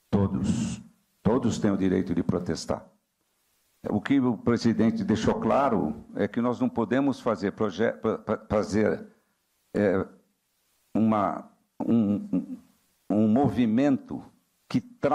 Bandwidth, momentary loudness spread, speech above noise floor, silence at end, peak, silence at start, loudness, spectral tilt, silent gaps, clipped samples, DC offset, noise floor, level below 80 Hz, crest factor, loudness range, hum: 10.5 kHz; 10 LU; 48 dB; 0 s; -12 dBFS; 0.1 s; -26 LUFS; -7 dB/octave; none; under 0.1%; under 0.1%; -73 dBFS; -54 dBFS; 14 dB; 3 LU; none